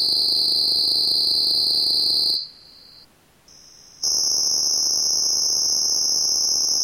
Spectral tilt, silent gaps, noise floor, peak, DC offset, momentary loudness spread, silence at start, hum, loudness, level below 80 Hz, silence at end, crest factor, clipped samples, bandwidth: 1.5 dB/octave; none; -53 dBFS; -8 dBFS; under 0.1%; 3 LU; 0 s; none; -17 LUFS; -56 dBFS; 0 s; 14 dB; under 0.1%; 17 kHz